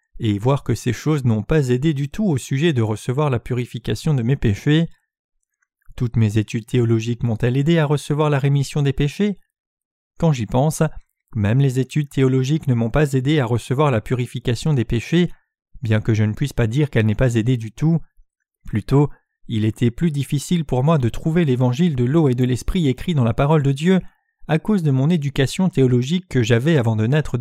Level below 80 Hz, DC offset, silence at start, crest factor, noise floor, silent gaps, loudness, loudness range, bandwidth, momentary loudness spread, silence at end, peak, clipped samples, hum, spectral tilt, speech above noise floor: -38 dBFS; under 0.1%; 0.15 s; 16 dB; -70 dBFS; 5.19-5.29 s, 9.60-9.77 s, 9.85-10.11 s; -19 LUFS; 3 LU; 14 kHz; 6 LU; 0 s; -4 dBFS; under 0.1%; none; -7 dB/octave; 52 dB